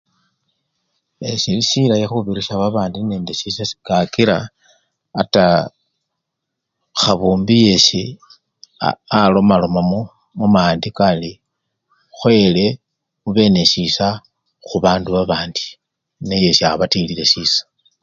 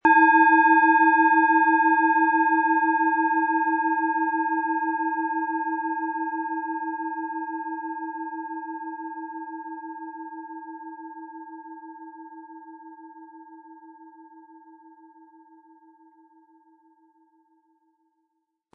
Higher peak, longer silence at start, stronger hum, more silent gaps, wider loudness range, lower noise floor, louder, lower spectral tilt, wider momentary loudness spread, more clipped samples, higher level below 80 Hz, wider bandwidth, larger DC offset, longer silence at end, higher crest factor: first, 0 dBFS vs -6 dBFS; first, 1.2 s vs 0.05 s; neither; neither; second, 4 LU vs 24 LU; about the same, -78 dBFS vs -78 dBFS; first, -15 LUFS vs -22 LUFS; second, -5 dB/octave vs -6.5 dB/octave; second, 13 LU vs 24 LU; neither; first, -46 dBFS vs -80 dBFS; first, 7.6 kHz vs 3.7 kHz; neither; second, 0.4 s vs 4.35 s; about the same, 18 dB vs 18 dB